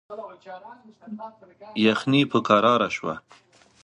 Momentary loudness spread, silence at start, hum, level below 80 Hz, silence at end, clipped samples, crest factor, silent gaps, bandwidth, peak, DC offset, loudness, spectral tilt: 23 LU; 0.1 s; none; -66 dBFS; 0.65 s; under 0.1%; 24 dB; none; 10.5 kHz; -2 dBFS; under 0.1%; -22 LUFS; -6 dB/octave